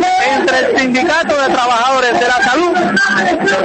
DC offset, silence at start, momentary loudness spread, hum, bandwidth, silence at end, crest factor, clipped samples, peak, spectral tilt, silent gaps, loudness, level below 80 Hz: under 0.1%; 0 s; 1 LU; none; 8.8 kHz; 0 s; 10 dB; under 0.1%; -2 dBFS; -3.5 dB/octave; none; -12 LUFS; -48 dBFS